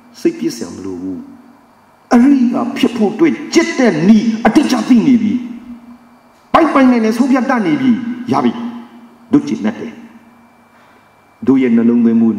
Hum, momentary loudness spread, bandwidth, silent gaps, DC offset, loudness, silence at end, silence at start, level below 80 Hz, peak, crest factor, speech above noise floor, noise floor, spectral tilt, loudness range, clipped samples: none; 15 LU; 11.5 kHz; none; under 0.1%; -13 LUFS; 0 s; 0.2 s; -50 dBFS; 0 dBFS; 14 dB; 35 dB; -47 dBFS; -6 dB/octave; 6 LU; under 0.1%